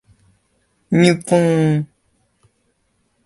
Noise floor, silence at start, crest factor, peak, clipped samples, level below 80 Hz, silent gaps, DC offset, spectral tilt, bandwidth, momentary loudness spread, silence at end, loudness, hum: -65 dBFS; 0.9 s; 18 dB; 0 dBFS; under 0.1%; -56 dBFS; none; under 0.1%; -6.5 dB/octave; 11.5 kHz; 8 LU; 1.4 s; -16 LUFS; none